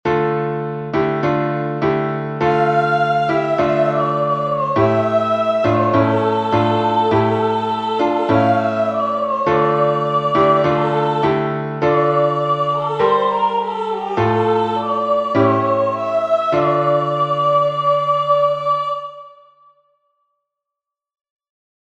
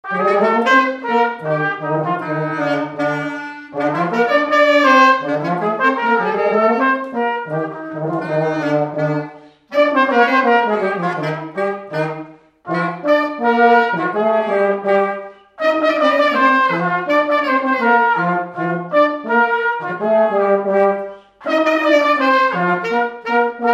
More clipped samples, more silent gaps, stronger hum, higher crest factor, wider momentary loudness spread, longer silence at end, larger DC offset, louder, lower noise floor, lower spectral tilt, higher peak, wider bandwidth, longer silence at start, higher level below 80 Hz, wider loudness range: neither; neither; neither; about the same, 16 dB vs 16 dB; second, 5 LU vs 10 LU; first, 2.6 s vs 0 s; neither; about the same, -17 LUFS vs -16 LUFS; first, -84 dBFS vs -36 dBFS; first, -8 dB/octave vs -6 dB/octave; about the same, -2 dBFS vs 0 dBFS; second, 8.4 kHz vs 14 kHz; about the same, 0.05 s vs 0.05 s; first, -52 dBFS vs -68 dBFS; about the same, 2 LU vs 4 LU